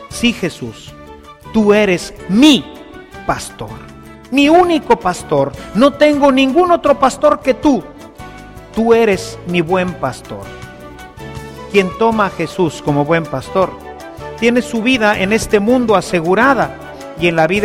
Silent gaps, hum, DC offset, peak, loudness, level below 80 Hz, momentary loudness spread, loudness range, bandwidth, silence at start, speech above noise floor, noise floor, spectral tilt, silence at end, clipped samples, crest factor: none; none; under 0.1%; 0 dBFS; -13 LUFS; -40 dBFS; 21 LU; 5 LU; 16 kHz; 0 s; 22 dB; -35 dBFS; -5 dB/octave; 0 s; under 0.1%; 14 dB